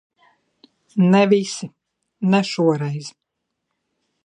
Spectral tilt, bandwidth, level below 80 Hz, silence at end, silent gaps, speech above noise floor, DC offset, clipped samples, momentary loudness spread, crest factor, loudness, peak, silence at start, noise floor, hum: -6.5 dB/octave; 10.5 kHz; -72 dBFS; 1.15 s; none; 60 dB; under 0.1%; under 0.1%; 16 LU; 18 dB; -19 LUFS; -2 dBFS; 0.95 s; -78 dBFS; none